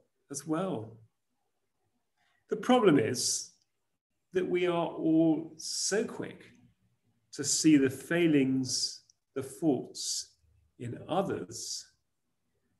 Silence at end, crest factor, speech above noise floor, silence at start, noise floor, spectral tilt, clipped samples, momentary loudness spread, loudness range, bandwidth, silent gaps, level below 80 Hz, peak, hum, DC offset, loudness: 1 s; 20 dB; 54 dB; 0.3 s; -84 dBFS; -4 dB/octave; under 0.1%; 18 LU; 6 LU; 12.5 kHz; 4.01-4.10 s; -74 dBFS; -12 dBFS; none; under 0.1%; -30 LUFS